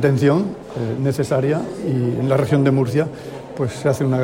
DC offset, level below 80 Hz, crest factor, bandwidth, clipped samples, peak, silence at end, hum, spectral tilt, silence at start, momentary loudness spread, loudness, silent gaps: under 0.1%; -52 dBFS; 14 dB; 16 kHz; under 0.1%; -4 dBFS; 0 s; none; -7.5 dB/octave; 0 s; 10 LU; -19 LUFS; none